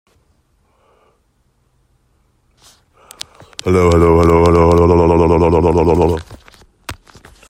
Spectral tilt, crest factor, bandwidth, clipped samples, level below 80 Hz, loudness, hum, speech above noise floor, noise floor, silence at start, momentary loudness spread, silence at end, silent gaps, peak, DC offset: -7.5 dB/octave; 14 dB; 14.5 kHz; under 0.1%; -32 dBFS; -11 LUFS; none; 49 dB; -60 dBFS; 3.65 s; 22 LU; 0.55 s; none; 0 dBFS; under 0.1%